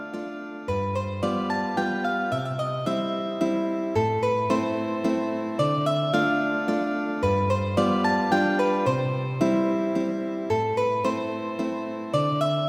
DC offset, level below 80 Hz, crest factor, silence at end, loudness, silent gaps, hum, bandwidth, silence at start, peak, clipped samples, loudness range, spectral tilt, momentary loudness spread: under 0.1%; -56 dBFS; 16 dB; 0 s; -25 LUFS; none; none; 15.5 kHz; 0 s; -8 dBFS; under 0.1%; 3 LU; -7 dB/octave; 7 LU